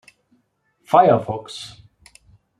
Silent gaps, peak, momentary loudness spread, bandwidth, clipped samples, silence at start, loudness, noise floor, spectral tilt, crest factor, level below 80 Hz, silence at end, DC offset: none; -2 dBFS; 20 LU; 12.5 kHz; under 0.1%; 0.9 s; -17 LUFS; -66 dBFS; -6.5 dB/octave; 20 dB; -60 dBFS; 0.95 s; under 0.1%